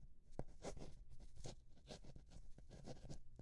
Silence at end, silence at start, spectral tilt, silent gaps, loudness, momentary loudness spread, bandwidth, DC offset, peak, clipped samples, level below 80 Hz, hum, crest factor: 0 s; 0 s; -5 dB/octave; none; -59 LUFS; 10 LU; 11.5 kHz; under 0.1%; -30 dBFS; under 0.1%; -60 dBFS; none; 24 dB